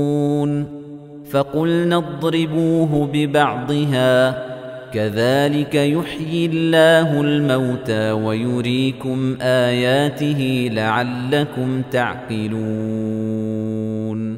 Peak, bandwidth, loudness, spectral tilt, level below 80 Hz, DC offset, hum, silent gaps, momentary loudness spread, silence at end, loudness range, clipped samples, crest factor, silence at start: -2 dBFS; 16 kHz; -18 LUFS; -6.5 dB/octave; -52 dBFS; under 0.1%; none; none; 8 LU; 0 s; 4 LU; under 0.1%; 16 dB; 0 s